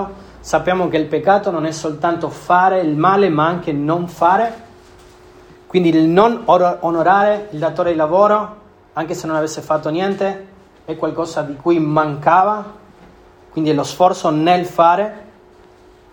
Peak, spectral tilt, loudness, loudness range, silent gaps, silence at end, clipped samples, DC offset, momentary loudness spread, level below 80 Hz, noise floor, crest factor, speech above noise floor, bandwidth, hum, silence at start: 0 dBFS; -6 dB/octave; -16 LUFS; 4 LU; none; 0.9 s; under 0.1%; under 0.1%; 10 LU; -52 dBFS; -46 dBFS; 16 dB; 30 dB; 18 kHz; none; 0 s